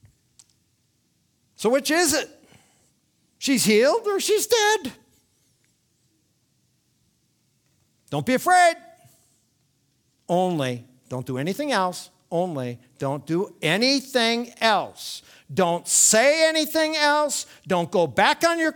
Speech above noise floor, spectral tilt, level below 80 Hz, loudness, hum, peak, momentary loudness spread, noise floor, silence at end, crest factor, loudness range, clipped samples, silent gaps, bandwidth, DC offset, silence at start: 46 dB; -3 dB/octave; -66 dBFS; -21 LUFS; none; -2 dBFS; 14 LU; -68 dBFS; 0 s; 22 dB; 8 LU; under 0.1%; none; 19.5 kHz; under 0.1%; 1.6 s